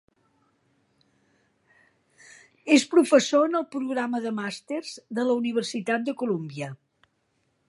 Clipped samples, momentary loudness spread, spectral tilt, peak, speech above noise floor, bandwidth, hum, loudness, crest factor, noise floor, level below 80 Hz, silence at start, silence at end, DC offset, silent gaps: under 0.1%; 14 LU; -4.5 dB/octave; -6 dBFS; 48 dB; 11.5 kHz; none; -25 LUFS; 22 dB; -72 dBFS; -80 dBFS; 2.65 s; 0.95 s; under 0.1%; none